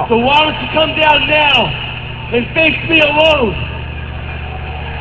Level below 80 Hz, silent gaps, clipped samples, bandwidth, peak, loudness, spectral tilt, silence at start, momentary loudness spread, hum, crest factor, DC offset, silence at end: -28 dBFS; none; under 0.1%; 8 kHz; 0 dBFS; -11 LUFS; -6 dB/octave; 0 s; 15 LU; 60 Hz at -30 dBFS; 14 dB; 0.7%; 0 s